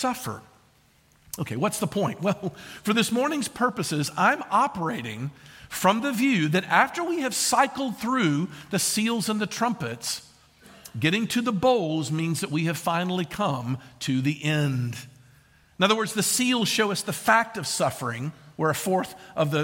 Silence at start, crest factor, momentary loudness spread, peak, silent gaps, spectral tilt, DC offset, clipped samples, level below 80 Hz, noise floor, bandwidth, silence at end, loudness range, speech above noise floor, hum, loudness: 0 s; 22 dB; 11 LU; -4 dBFS; none; -4 dB/octave; under 0.1%; under 0.1%; -64 dBFS; -60 dBFS; 17 kHz; 0 s; 3 LU; 35 dB; none; -25 LUFS